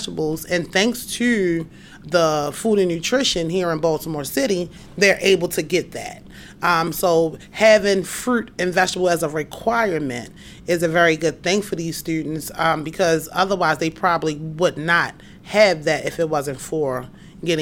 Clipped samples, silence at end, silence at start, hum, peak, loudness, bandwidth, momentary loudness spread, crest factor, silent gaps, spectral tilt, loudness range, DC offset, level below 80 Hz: under 0.1%; 0 s; 0 s; none; -4 dBFS; -20 LUFS; 17 kHz; 10 LU; 16 dB; none; -4 dB/octave; 2 LU; under 0.1%; -50 dBFS